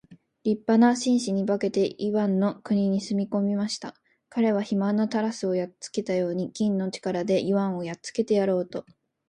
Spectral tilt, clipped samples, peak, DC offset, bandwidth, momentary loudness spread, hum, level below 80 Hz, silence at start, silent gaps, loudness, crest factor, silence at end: -6 dB/octave; under 0.1%; -8 dBFS; under 0.1%; 11 kHz; 9 LU; none; -70 dBFS; 0.1 s; none; -26 LUFS; 18 dB; 0.45 s